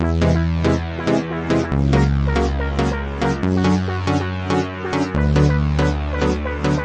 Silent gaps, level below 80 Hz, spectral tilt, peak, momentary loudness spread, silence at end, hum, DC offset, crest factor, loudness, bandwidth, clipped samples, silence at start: none; -26 dBFS; -7 dB/octave; -2 dBFS; 5 LU; 0 s; none; under 0.1%; 16 dB; -19 LUFS; 9 kHz; under 0.1%; 0 s